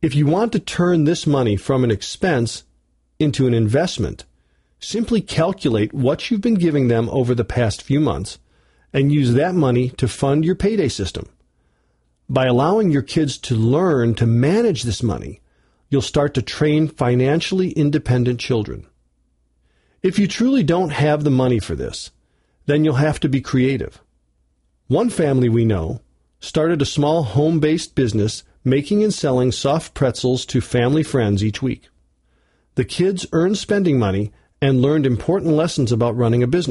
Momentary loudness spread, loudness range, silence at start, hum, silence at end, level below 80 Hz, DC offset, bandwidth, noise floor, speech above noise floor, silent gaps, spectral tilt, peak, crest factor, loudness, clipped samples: 9 LU; 3 LU; 0 s; none; 0 s; -42 dBFS; under 0.1%; 11.5 kHz; -63 dBFS; 46 dB; none; -6.5 dB/octave; -6 dBFS; 14 dB; -18 LUFS; under 0.1%